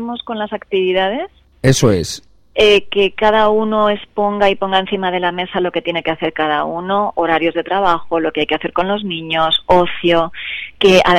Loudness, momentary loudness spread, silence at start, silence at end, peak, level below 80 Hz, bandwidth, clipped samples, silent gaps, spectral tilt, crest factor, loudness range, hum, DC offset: -16 LUFS; 10 LU; 0 s; 0 s; 0 dBFS; -42 dBFS; 15.5 kHz; under 0.1%; none; -4.5 dB/octave; 16 dB; 3 LU; none; under 0.1%